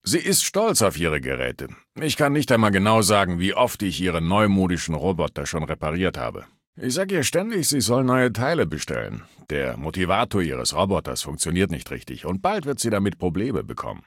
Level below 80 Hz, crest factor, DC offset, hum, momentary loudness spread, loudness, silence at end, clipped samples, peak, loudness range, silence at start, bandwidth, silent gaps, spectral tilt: -44 dBFS; 20 dB; under 0.1%; none; 11 LU; -22 LUFS; 0.1 s; under 0.1%; -2 dBFS; 4 LU; 0.05 s; 17 kHz; 6.67-6.73 s; -4.5 dB/octave